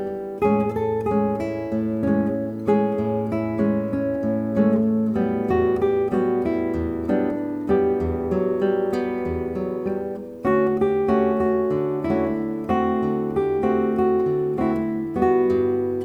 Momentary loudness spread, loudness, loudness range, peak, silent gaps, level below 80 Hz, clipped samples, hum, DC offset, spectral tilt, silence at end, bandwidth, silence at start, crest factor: 6 LU; -22 LUFS; 2 LU; -8 dBFS; none; -46 dBFS; under 0.1%; none; under 0.1%; -9.5 dB/octave; 0 s; 5.6 kHz; 0 s; 14 dB